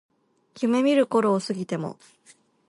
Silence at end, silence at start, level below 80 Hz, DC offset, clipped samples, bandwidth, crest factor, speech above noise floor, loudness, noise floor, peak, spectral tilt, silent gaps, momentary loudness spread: 0.75 s; 0.55 s; -76 dBFS; under 0.1%; under 0.1%; 11.5 kHz; 16 dB; 32 dB; -24 LUFS; -55 dBFS; -10 dBFS; -6 dB/octave; none; 11 LU